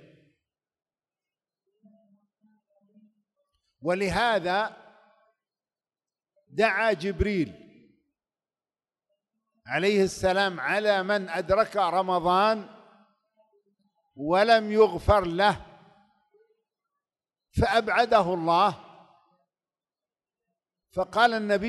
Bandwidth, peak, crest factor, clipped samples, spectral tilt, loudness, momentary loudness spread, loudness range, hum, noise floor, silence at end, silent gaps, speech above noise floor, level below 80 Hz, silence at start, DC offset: 12 kHz; -8 dBFS; 20 dB; under 0.1%; -5 dB/octave; -25 LUFS; 11 LU; 5 LU; none; under -90 dBFS; 0 s; none; over 66 dB; -48 dBFS; 3.85 s; under 0.1%